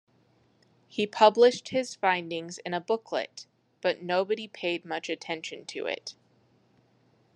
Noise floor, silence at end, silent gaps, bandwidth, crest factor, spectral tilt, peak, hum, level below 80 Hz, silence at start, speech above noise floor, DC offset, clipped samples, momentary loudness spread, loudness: -65 dBFS; 1.25 s; none; 10 kHz; 24 dB; -3.5 dB/octave; -6 dBFS; none; -84 dBFS; 0.95 s; 38 dB; under 0.1%; under 0.1%; 15 LU; -28 LUFS